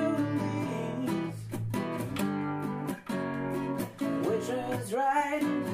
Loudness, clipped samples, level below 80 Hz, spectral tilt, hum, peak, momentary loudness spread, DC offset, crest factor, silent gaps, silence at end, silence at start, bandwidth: -32 LUFS; under 0.1%; -62 dBFS; -6.5 dB/octave; none; -16 dBFS; 6 LU; under 0.1%; 16 dB; none; 0 s; 0 s; 15.5 kHz